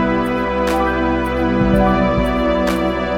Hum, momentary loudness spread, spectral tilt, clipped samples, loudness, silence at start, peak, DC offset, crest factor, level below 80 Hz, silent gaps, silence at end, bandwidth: none; 4 LU; -7 dB/octave; under 0.1%; -17 LUFS; 0 s; -2 dBFS; 0.5%; 14 dB; -28 dBFS; none; 0 s; 16.5 kHz